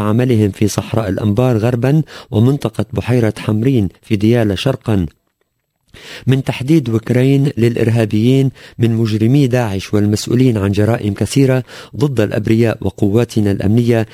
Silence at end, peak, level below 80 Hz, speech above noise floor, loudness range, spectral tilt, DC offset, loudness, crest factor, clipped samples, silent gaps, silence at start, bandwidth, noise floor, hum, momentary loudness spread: 0.05 s; 0 dBFS; -38 dBFS; 53 dB; 3 LU; -7 dB/octave; under 0.1%; -15 LUFS; 14 dB; under 0.1%; none; 0 s; 16 kHz; -67 dBFS; none; 5 LU